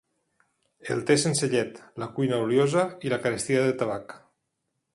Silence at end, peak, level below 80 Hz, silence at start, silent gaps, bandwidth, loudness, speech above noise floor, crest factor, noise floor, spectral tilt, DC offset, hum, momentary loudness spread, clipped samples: 0.75 s; -8 dBFS; -66 dBFS; 0.85 s; none; 11.5 kHz; -26 LUFS; 54 dB; 20 dB; -79 dBFS; -5 dB/octave; under 0.1%; none; 13 LU; under 0.1%